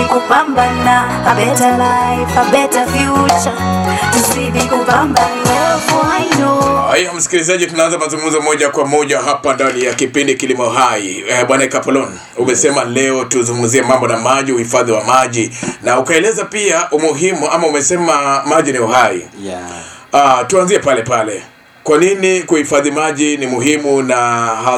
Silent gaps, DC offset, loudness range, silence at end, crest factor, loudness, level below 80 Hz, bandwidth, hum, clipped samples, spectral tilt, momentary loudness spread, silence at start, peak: none; under 0.1%; 1 LU; 0 s; 12 dB; -12 LUFS; -42 dBFS; 18 kHz; none; under 0.1%; -3.5 dB/octave; 4 LU; 0 s; 0 dBFS